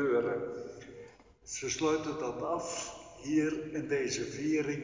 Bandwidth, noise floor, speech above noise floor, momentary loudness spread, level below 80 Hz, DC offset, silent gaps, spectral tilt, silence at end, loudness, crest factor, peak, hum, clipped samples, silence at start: 7.6 kHz; -54 dBFS; 20 dB; 17 LU; -64 dBFS; under 0.1%; none; -4 dB/octave; 0 s; -34 LUFS; 16 dB; -18 dBFS; none; under 0.1%; 0 s